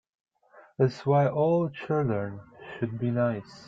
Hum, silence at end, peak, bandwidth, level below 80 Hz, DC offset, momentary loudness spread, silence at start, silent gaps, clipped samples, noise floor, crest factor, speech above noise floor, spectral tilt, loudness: none; 0 s; -10 dBFS; 7.4 kHz; -64 dBFS; under 0.1%; 15 LU; 0.55 s; none; under 0.1%; -57 dBFS; 18 dB; 30 dB; -9 dB/octave; -27 LUFS